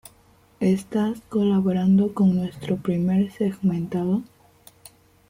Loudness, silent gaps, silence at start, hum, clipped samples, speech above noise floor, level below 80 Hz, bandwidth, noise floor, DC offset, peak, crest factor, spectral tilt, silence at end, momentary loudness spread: -23 LUFS; none; 0.6 s; none; under 0.1%; 35 dB; -58 dBFS; 15.5 kHz; -56 dBFS; under 0.1%; -10 dBFS; 14 dB; -8.5 dB/octave; 1.05 s; 7 LU